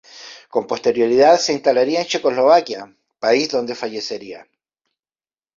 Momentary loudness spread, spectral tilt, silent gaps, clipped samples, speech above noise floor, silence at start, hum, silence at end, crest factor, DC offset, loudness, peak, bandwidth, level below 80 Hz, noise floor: 17 LU; -3.5 dB/octave; none; under 0.1%; over 73 dB; 0.15 s; none; 1.2 s; 18 dB; under 0.1%; -17 LUFS; -2 dBFS; 7.6 kHz; -64 dBFS; under -90 dBFS